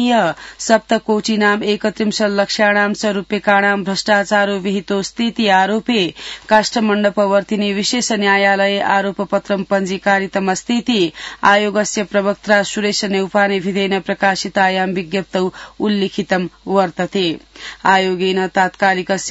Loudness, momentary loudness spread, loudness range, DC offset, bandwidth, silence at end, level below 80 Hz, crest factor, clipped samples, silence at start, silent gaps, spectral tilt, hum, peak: -16 LUFS; 6 LU; 3 LU; under 0.1%; 8 kHz; 0 s; -52 dBFS; 16 dB; under 0.1%; 0 s; none; -4 dB/octave; none; 0 dBFS